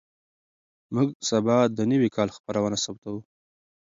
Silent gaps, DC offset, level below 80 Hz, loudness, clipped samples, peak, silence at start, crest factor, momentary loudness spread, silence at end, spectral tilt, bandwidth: 1.15-1.20 s, 2.40-2.44 s, 2.98-3.02 s; under 0.1%; -64 dBFS; -25 LUFS; under 0.1%; -8 dBFS; 0.9 s; 18 dB; 12 LU; 0.75 s; -5.5 dB/octave; 7.8 kHz